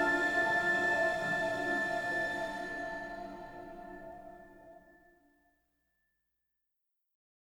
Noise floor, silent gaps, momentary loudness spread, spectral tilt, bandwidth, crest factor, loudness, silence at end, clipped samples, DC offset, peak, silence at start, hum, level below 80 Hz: -84 dBFS; none; 19 LU; -4 dB/octave; over 20 kHz; 18 dB; -32 LUFS; 2.8 s; under 0.1%; under 0.1%; -18 dBFS; 0 s; none; -62 dBFS